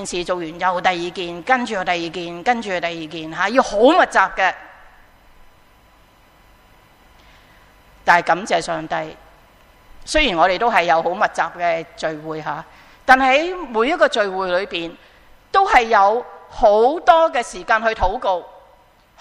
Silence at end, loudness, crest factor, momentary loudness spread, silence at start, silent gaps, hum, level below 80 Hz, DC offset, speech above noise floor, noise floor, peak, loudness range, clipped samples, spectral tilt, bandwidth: 0.7 s; -18 LUFS; 20 dB; 13 LU; 0 s; none; none; -42 dBFS; under 0.1%; 34 dB; -52 dBFS; 0 dBFS; 6 LU; under 0.1%; -3.5 dB/octave; 13 kHz